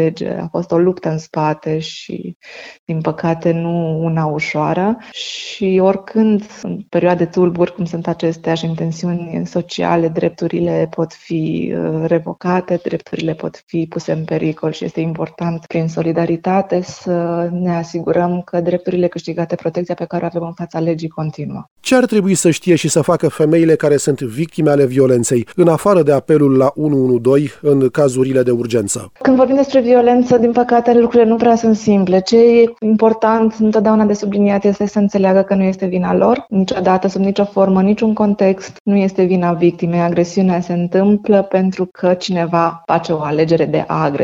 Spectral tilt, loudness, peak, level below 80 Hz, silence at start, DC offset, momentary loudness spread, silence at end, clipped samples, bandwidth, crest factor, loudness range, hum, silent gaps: -6.5 dB/octave; -15 LUFS; 0 dBFS; -52 dBFS; 0 s; under 0.1%; 9 LU; 0 s; under 0.1%; 17.5 kHz; 14 dB; 7 LU; none; 2.35-2.40 s, 2.79-2.87 s, 13.63-13.67 s, 21.71-21.76 s, 38.80-38.85 s